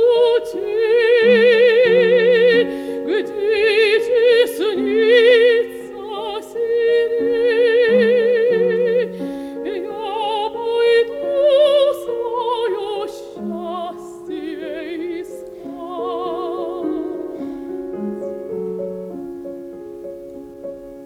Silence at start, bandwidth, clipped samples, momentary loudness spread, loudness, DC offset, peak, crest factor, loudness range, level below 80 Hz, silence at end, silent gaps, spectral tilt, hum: 0 s; 13 kHz; under 0.1%; 18 LU; -17 LUFS; under 0.1%; -2 dBFS; 14 dB; 13 LU; -58 dBFS; 0 s; none; -5 dB/octave; none